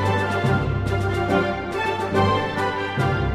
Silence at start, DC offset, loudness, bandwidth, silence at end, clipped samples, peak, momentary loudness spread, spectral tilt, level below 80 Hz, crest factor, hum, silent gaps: 0 s; under 0.1%; -22 LUFS; 13 kHz; 0 s; under 0.1%; -6 dBFS; 4 LU; -6.5 dB/octave; -36 dBFS; 14 dB; none; none